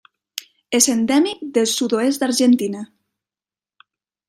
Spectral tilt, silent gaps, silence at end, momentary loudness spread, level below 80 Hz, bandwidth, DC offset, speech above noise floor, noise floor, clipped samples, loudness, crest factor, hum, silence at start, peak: -2.5 dB/octave; none; 1.45 s; 17 LU; -68 dBFS; 16 kHz; under 0.1%; over 73 dB; under -90 dBFS; under 0.1%; -18 LUFS; 20 dB; none; 0.35 s; 0 dBFS